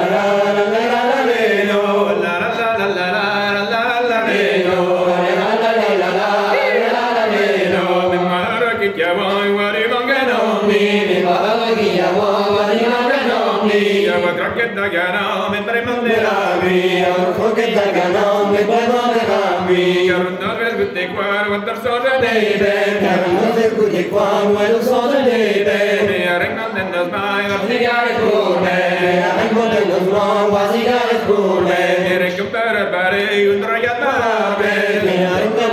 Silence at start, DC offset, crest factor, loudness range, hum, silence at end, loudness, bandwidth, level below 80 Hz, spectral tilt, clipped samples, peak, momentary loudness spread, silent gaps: 0 s; under 0.1%; 12 dB; 1 LU; none; 0 s; -15 LUFS; 14.5 kHz; -56 dBFS; -5 dB/octave; under 0.1%; -2 dBFS; 3 LU; none